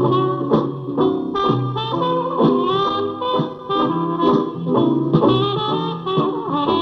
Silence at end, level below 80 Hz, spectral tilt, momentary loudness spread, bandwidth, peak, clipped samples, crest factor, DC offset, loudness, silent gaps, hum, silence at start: 0 s; -52 dBFS; -9 dB/octave; 5 LU; 6.4 kHz; -2 dBFS; under 0.1%; 16 dB; under 0.1%; -19 LUFS; none; none; 0 s